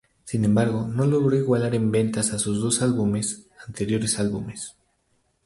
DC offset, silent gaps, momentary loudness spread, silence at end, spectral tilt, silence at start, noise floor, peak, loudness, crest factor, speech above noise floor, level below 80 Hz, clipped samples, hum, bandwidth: under 0.1%; none; 12 LU; 0.75 s; -5.5 dB/octave; 0.25 s; -69 dBFS; -8 dBFS; -23 LUFS; 16 dB; 46 dB; -52 dBFS; under 0.1%; none; 11.5 kHz